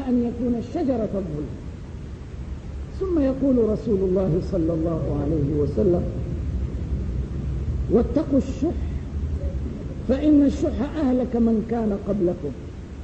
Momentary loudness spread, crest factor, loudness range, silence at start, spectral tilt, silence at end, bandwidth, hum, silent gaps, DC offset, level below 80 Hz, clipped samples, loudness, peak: 14 LU; 16 dB; 3 LU; 0 s; -9.5 dB/octave; 0 s; 8.4 kHz; none; none; under 0.1%; -32 dBFS; under 0.1%; -24 LUFS; -8 dBFS